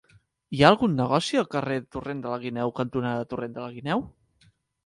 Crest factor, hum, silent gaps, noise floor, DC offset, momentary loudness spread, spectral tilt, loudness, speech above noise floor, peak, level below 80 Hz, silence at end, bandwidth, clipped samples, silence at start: 26 dB; none; none; -63 dBFS; under 0.1%; 15 LU; -6 dB/octave; -26 LUFS; 38 dB; -2 dBFS; -56 dBFS; 0.75 s; 11.5 kHz; under 0.1%; 0.5 s